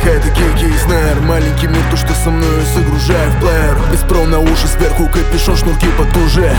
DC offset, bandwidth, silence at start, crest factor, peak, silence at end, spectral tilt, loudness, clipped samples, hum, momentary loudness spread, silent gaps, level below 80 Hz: under 0.1%; 19.5 kHz; 0 s; 10 dB; 0 dBFS; 0 s; -5.5 dB/octave; -13 LUFS; under 0.1%; none; 2 LU; none; -12 dBFS